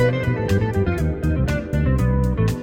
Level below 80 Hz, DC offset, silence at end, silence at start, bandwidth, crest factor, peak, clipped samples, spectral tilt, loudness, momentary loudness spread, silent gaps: -26 dBFS; under 0.1%; 0 s; 0 s; 16.5 kHz; 14 dB; -6 dBFS; under 0.1%; -8 dB/octave; -21 LUFS; 3 LU; none